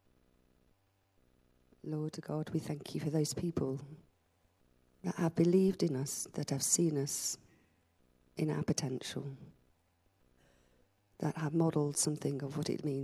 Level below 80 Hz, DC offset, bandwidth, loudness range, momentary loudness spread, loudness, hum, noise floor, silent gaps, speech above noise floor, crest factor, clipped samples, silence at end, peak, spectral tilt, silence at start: -68 dBFS; under 0.1%; 14.5 kHz; 8 LU; 14 LU; -35 LUFS; none; -74 dBFS; none; 39 dB; 20 dB; under 0.1%; 0 s; -18 dBFS; -5 dB/octave; 1.85 s